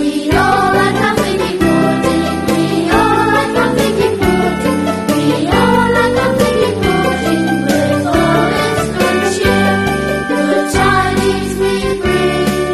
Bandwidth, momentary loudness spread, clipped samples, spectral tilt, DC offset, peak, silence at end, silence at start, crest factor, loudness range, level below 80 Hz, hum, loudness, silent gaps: 13.5 kHz; 4 LU; under 0.1%; -5.5 dB/octave; 0.3%; 0 dBFS; 0 s; 0 s; 12 dB; 1 LU; -32 dBFS; none; -13 LUFS; none